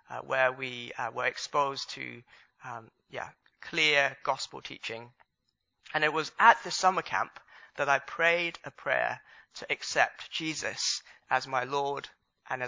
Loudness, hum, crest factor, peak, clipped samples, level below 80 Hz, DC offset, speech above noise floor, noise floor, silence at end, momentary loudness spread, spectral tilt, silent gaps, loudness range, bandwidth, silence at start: -29 LUFS; none; 26 dB; -4 dBFS; under 0.1%; -74 dBFS; under 0.1%; 50 dB; -81 dBFS; 0 s; 19 LU; -2 dB/octave; none; 5 LU; 7.6 kHz; 0.1 s